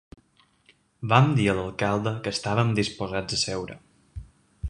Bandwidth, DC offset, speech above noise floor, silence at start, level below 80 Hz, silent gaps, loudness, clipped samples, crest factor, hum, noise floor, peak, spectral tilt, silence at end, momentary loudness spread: 11 kHz; under 0.1%; 38 dB; 1 s; -48 dBFS; none; -25 LUFS; under 0.1%; 24 dB; none; -63 dBFS; -2 dBFS; -5.5 dB/octave; 0 s; 23 LU